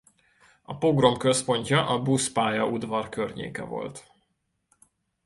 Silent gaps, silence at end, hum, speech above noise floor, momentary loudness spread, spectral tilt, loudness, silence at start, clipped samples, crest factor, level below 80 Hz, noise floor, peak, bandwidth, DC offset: none; 1.25 s; none; 50 dB; 14 LU; -4.5 dB/octave; -25 LUFS; 0.7 s; under 0.1%; 22 dB; -60 dBFS; -75 dBFS; -4 dBFS; 11.5 kHz; under 0.1%